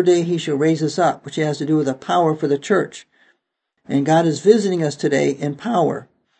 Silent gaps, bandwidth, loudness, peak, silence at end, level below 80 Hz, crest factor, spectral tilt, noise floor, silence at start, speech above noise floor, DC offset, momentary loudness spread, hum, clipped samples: none; 8.8 kHz; -19 LUFS; 0 dBFS; 0.35 s; -68 dBFS; 18 dB; -6 dB/octave; -74 dBFS; 0 s; 56 dB; under 0.1%; 7 LU; none; under 0.1%